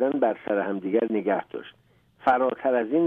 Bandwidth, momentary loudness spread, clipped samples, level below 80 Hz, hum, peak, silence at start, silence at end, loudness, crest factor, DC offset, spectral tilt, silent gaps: 4.4 kHz; 6 LU; under 0.1%; -70 dBFS; none; -8 dBFS; 0 s; 0 s; -25 LUFS; 16 dB; under 0.1%; -8.5 dB/octave; none